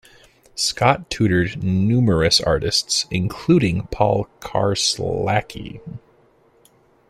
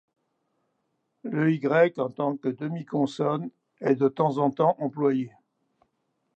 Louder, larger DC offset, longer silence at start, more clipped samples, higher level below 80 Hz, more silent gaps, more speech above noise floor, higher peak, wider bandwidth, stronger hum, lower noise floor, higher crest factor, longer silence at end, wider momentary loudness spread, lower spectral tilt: first, -19 LUFS vs -26 LUFS; neither; second, 0.55 s vs 1.25 s; neither; first, -42 dBFS vs -80 dBFS; neither; second, 37 dB vs 51 dB; first, 0 dBFS vs -8 dBFS; first, 15 kHz vs 8.4 kHz; neither; second, -56 dBFS vs -76 dBFS; about the same, 20 dB vs 20 dB; about the same, 1.1 s vs 1.1 s; first, 17 LU vs 11 LU; second, -4.5 dB/octave vs -8.5 dB/octave